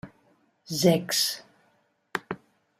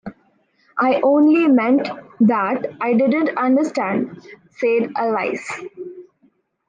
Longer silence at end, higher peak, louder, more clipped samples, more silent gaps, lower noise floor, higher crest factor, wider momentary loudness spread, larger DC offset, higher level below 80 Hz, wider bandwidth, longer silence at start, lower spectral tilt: second, 0.45 s vs 0.65 s; about the same, -8 dBFS vs -6 dBFS; second, -26 LUFS vs -18 LUFS; neither; neither; first, -68 dBFS vs -60 dBFS; first, 22 dB vs 14 dB; about the same, 17 LU vs 16 LU; neither; about the same, -68 dBFS vs -68 dBFS; first, 15.5 kHz vs 9.4 kHz; about the same, 0.05 s vs 0.05 s; second, -4 dB/octave vs -7 dB/octave